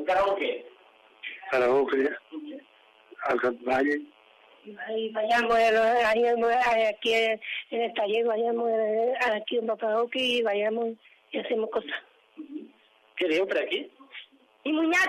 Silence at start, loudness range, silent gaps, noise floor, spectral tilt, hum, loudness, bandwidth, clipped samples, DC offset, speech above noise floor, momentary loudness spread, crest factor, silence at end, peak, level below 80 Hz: 0 s; 7 LU; none; -60 dBFS; -3.5 dB/octave; none; -26 LUFS; 14 kHz; under 0.1%; under 0.1%; 34 dB; 19 LU; 14 dB; 0 s; -14 dBFS; -66 dBFS